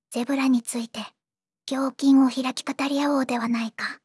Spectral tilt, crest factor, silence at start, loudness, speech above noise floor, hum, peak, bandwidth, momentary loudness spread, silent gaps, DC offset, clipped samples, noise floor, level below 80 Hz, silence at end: -3.5 dB/octave; 14 dB; 0.1 s; -24 LUFS; over 67 dB; none; -10 dBFS; 12 kHz; 14 LU; none; under 0.1%; under 0.1%; under -90 dBFS; -82 dBFS; 0.1 s